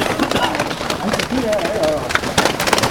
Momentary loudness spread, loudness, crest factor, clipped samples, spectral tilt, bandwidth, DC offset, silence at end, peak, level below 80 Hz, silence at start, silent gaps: 4 LU; -18 LUFS; 18 dB; under 0.1%; -3.5 dB/octave; over 20 kHz; 0.1%; 0 s; 0 dBFS; -40 dBFS; 0 s; none